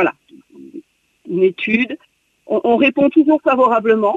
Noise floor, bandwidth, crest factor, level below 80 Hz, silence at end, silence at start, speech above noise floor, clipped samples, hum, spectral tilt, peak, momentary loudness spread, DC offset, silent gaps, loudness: -45 dBFS; 7 kHz; 14 dB; -60 dBFS; 0 s; 0 s; 31 dB; under 0.1%; none; -7.5 dB/octave; -2 dBFS; 10 LU; under 0.1%; none; -15 LUFS